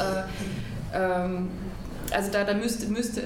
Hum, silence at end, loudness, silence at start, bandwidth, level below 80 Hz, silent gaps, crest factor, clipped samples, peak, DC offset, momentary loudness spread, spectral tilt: none; 0 s; -29 LUFS; 0 s; 19 kHz; -42 dBFS; none; 20 dB; under 0.1%; -10 dBFS; under 0.1%; 9 LU; -5 dB/octave